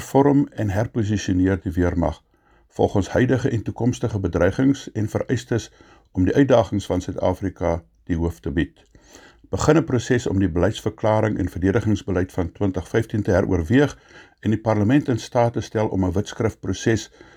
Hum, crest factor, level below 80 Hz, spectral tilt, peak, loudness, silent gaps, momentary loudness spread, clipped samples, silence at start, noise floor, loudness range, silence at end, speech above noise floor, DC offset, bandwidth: none; 18 dB; -40 dBFS; -7 dB/octave; -2 dBFS; -22 LUFS; none; 7 LU; under 0.1%; 0 s; -58 dBFS; 2 LU; 0.3 s; 37 dB; under 0.1%; 15 kHz